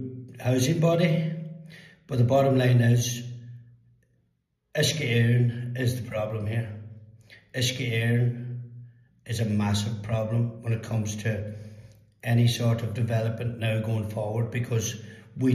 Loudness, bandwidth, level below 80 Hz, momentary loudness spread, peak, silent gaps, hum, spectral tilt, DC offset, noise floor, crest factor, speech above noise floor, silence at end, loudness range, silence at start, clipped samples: -26 LUFS; 14 kHz; -60 dBFS; 17 LU; -10 dBFS; none; none; -6 dB/octave; under 0.1%; -74 dBFS; 16 dB; 49 dB; 0 s; 5 LU; 0 s; under 0.1%